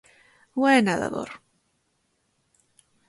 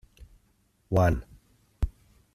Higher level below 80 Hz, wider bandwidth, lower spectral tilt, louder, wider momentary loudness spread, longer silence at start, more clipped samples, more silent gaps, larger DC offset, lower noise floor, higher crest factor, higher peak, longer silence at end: second, -64 dBFS vs -38 dBFS; second, 11.5 kHz vs 13.5 kHz; second, -5 dB/octave vs -8 dB/octave; first, -23 LUFS vs -28 LUFS; first, 19 LU vs 11 LU; first, 0.55 s vs 0.2 s; neither; neither; neither; first, -72 dBFS vs -68 dBFS; about the same, 22 dB vs 22 dB; first, -6 dBFS vs -10 dBFS; first, 1.7 s vs 0.45 s